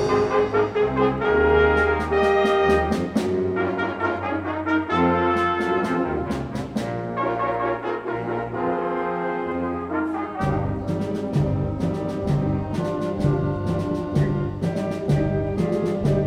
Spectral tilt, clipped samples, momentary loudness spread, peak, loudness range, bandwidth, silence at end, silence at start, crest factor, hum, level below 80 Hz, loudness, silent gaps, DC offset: -7.5 dB/octave; under 0.1%; 8 LU; -6 dBFS; 6 LU; 12 kHz; 0 s; 0 s; 16 dB; none; -40 dBFS; -23 LUFS; none; under 0.1%